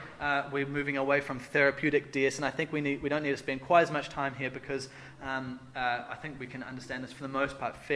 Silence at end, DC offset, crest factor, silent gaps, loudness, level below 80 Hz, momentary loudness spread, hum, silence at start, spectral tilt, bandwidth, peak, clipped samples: 0 s; under 0.1%; 22 dB; none; -31 LUFS; -60 dBFS; 14 LU; none; 0 s; -5 dB/octave; 11 kHz; -10 dBFS; under 0.1%